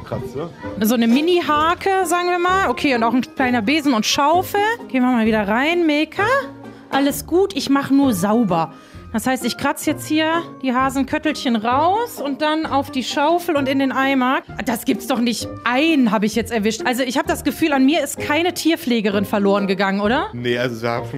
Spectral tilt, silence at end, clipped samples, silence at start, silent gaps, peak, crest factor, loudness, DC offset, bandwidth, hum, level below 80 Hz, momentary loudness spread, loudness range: -4.5 dB/octave; 0 s; under 0.1%; 0 s; none; -2 dBFS; 16 dB; -18 LUFS; under 0.1%; 16 kHz; none; -48 dBFS; 6 LU; 2 LU